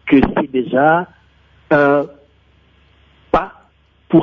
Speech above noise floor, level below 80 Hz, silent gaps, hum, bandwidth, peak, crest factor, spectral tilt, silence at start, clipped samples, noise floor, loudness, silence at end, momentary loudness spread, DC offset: 40 dB; -42 dBFS; none; none; 6 kHz; -2 dBFS; 16 dB; -9 dB/octave; 0.05 s; under 0.1%; -53 dBFS; -15 LUFS; 0 s; 13 LU; under 0.1%